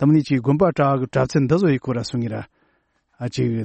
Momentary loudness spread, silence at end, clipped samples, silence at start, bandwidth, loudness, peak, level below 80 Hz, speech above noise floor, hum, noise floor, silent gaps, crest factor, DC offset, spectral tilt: 11 LU; 0 s; under 0.1%; 0 s; 8.6 kHz; -20 LUFS; -6 dBFS; -52 dBFS; 47 dB; none; -66 dBFS; none; 14 dB; under 0.1%; -7.5 dB/octave